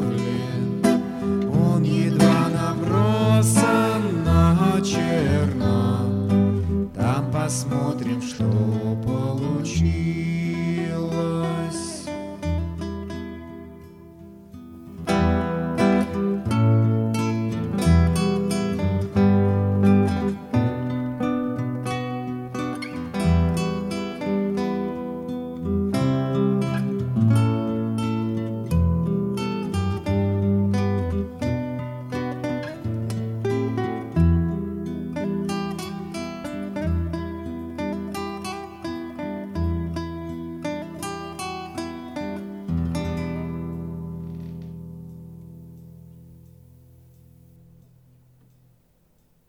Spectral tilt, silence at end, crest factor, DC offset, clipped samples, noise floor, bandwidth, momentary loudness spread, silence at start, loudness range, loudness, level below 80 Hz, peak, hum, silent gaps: -7 dB/octave; 3.1 s; 20 dB; under 0.1%; under 0.1%; -62 dBFS; 15 kHz; 14 LU; 0 s; 11 LU; -24 LUFS; -38 dBFS; -4 dBFS; none; none